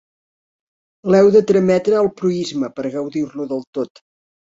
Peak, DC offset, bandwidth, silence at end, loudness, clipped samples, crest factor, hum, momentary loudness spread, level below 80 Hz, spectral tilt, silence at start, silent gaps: -2 dBFS; under 0.1%; 7.8 kHz; 0.75 s; -17 LUFS; under 0.1%; 16 dB; none; 15 LU; -58 dBFS; -7 dB/octave; 1.05 s; 3.67-3.73 s